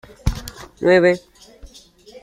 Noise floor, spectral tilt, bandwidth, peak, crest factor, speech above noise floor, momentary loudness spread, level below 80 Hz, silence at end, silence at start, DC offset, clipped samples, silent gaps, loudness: -46 dBFS; -6 dB/octave; 15.5 kHz; -2 dBFS; 20 dB; 28 dB; 18 LU; -34 dBFS; 0.05 s; 0.25 s; under 0.1%; under 0.1%; none; -18 LUFS